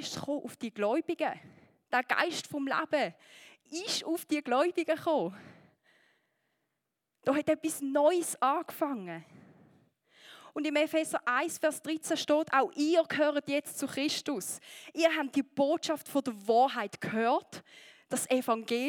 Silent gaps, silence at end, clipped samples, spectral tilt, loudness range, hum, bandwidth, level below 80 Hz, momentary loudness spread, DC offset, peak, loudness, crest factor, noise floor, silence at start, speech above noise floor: none; 0 s; under 0.1%; -3 dB/octave; 4 LU; none; 19 kHz; -84 dBFS; 9 LU; under 0.1%; -12 dBFS; -31 LUFS; 20 dB; -85 dBFS; 0 s; 54 dB